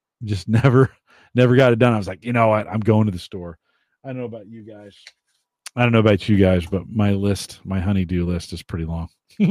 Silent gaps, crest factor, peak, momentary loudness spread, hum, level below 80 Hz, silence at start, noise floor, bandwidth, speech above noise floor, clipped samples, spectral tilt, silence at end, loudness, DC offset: none; 18 dB; -2 dBFS; 19 LU; none; -44 dBFS; 0.2 s; -44 dBFS; 12.5 kHz; 26 dB; under 0.1%; -7.5 dB/octave; 0 s; -19 LUFS; under 0.1%